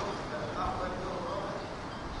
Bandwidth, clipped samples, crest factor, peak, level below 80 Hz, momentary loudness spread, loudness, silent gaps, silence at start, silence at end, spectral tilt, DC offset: 10.5 kHz; under 0.1%; 14 dB; -22 dBFS; -48 dBFS; 6 LU; -36 LUFS; none; 0 s; 0 s; -5.5 dB/octave; under 0.1%